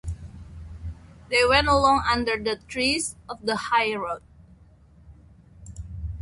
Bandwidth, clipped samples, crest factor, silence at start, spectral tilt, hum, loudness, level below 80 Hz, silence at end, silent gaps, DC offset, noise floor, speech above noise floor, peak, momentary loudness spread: 11.5 kHz; under 0.1%; 20 dB; 0.05 s; -3.5 dB/octave; none; -23 LUFS; -40 dBFS; 0 s; none; under 0.1%; -53 dBFS; 30 dB; -6 dBFS; 22 LU